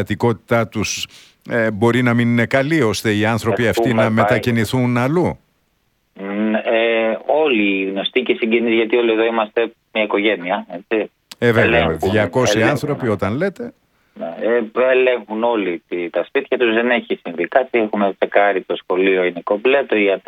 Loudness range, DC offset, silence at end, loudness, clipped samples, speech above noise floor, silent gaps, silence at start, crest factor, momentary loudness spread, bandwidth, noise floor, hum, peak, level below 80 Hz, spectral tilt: 2 LU; under 0.1%; 0.1 s; -17 LUFS; under 0.1%; 48 dB; none; 0 s; 16 dB; 8 LU; 17 kHz; -64 dBFS; none; 0 dBFS; -50 dBFS; -5.5 dB/octave